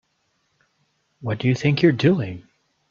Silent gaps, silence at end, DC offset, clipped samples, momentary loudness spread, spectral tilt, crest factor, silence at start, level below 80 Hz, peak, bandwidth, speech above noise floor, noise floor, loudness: none; 0.5 s; under 0.1%; under 0.1%; 16 LU; -7.5 dB/octave; 20 dB; 1.2 s; -58 dBFS; -2 dBFS; 7.4 kHz; 50 dB; -70 dBFS; -20 LUFS